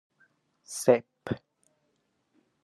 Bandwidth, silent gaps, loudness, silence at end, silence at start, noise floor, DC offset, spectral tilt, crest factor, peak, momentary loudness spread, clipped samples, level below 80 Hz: 13 kHz; none; -29 LUFS; 1.25 s; 0.7 s; -75 dBFS; under 0.1%; -5 dB/octave; 26 dB; -8 dBFS; 14 LU; under 0.1%; -68 dBFS